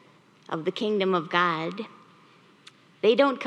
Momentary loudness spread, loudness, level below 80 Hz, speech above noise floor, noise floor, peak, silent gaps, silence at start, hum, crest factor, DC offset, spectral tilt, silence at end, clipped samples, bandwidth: 14 LU; -25 LUFS; -88 dBFS; 32 dB; -56 dBFS; -6 dBFS; none; 0.5 s; none; 22 dB; under 0.1%; -6 dB/octave; 0 s; under 0.1%; 9.4 kHz